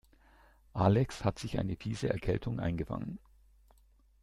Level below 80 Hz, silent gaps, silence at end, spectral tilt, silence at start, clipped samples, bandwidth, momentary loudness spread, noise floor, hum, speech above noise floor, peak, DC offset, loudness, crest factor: -52 dBFS; none; 1.05 s; -7.5 dB/octave; 0.75 s; under 0.1%; 12 kHz; 13 LU; -65 dBFS; none; 32 dB; -12 dBFS; under 0.1%; -34 LUFS; 22 dB